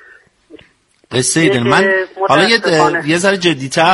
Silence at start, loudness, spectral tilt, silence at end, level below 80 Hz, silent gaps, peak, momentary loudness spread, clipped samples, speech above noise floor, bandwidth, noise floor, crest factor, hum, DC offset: 0.55 s; -12 LUFS; -3.5 dB/octave; 0 s; -52 dBFS; none; 0 dBFS; 5 LU; under 0.1%; 39 dB; 11.5 kHz; -51 dBFS; 14 dB; none; under 0.1%